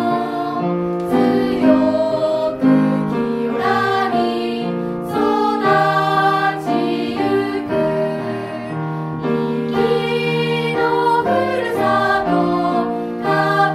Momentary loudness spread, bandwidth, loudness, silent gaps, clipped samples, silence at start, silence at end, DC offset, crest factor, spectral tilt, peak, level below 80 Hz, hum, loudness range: 7 LU; 14.5 kHz; -18 LUFS; none; under 0.1%; 0 s; 0 s; under 0.1%; 16 dB; -7 dB/octave; -2 dBFS; -52 dBFS; none; 3 LU